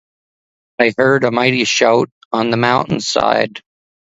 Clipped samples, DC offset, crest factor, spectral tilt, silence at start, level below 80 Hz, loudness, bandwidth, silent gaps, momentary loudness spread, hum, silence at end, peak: under 0.1%; under 0.1%; 16 dB; -4 dB/octave; 0.8 s; -54 dBFS; -15 LUFS; 8 kHz; 2.12-2.31 s; 7 LU; none; 0.55 s; 0 dBFS